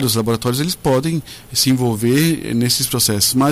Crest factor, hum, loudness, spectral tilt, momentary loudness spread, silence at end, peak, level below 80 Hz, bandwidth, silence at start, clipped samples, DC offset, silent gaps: 14 dB; none; -16 LUFS; -4 dB/octave; 5 LU; 0 s; -2 dBFS; -44 dBFS; 16 kHz; 0 s; under 0.1%; under 0.1%; none